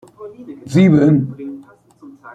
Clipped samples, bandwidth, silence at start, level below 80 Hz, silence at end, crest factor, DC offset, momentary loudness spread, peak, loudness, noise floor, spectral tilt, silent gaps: under 0.1%; 9.6 kHz; 0.2 s; -52 dBFS; 0.75 s; 14 dB; under 0.1%; 25 LU; -2 dBFS; -14 LUFS; -43 dBFS; -8.5 dB/octave; none